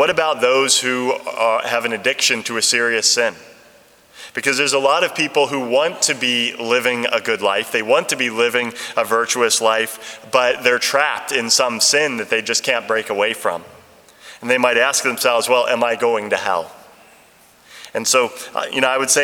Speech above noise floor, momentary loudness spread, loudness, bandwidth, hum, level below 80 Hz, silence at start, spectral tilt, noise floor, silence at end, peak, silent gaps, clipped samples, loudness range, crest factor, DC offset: 32 dB; 8 LU; -17 LUFS; 19.5 kHz; none; -68 dBFS; 0 s; -1 dB/octave; -50 dBFS; 0 s; 0 dBFS; none; under 0.1%; 2 LU; 18 dB; under 0.1%